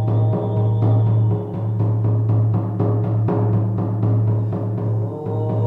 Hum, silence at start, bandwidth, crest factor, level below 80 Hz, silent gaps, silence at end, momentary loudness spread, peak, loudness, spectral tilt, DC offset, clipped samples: none; 0 s; 2.2 kHz; 10 dB; -48 dBFS; none; 0 s; 6 LU; -8 dBFS; -20 LUFS; -12 dB/octave; under 0.1%; under 0.1%